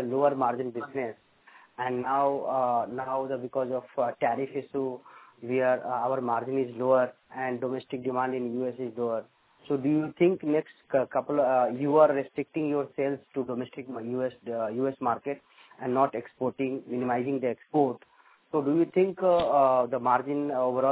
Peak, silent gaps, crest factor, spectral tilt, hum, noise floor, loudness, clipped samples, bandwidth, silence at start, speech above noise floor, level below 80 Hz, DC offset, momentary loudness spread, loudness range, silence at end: -8 dBFS; none; 20 dB; -10.5 dB/octave; none; -57 dBFS; -28 LUFS; under 0.1%; 4 kHz; 0 s; 29 dB; -70 dBFS; under 0.1%; 10 LU; 5 LU; 0 s